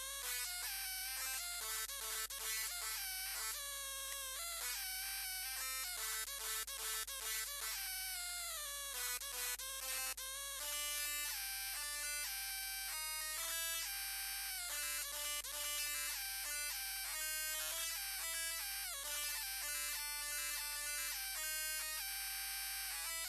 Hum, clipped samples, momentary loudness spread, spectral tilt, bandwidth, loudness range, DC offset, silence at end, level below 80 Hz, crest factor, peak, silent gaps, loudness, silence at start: none; under 0.1%; 2 LU; 2.5 dB/octave; 13.5 kHz; 1 LU; under 0.1%; 0 s; -64 dBFS; 16 dB; -28 dBFS; none; -40 LUFS; 0 s